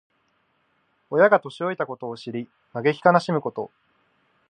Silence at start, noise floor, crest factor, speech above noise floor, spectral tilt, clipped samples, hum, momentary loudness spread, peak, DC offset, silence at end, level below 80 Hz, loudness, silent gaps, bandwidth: 1.1 s; -68 dBFS; 22 dB; 46 dB; -7 dB/octave; under 0.1%; none; 16 LU; -2 dBFS; under 0.1%; 0.85 s; -76 dBFS; -23 LUFS; none; 9.8 kHz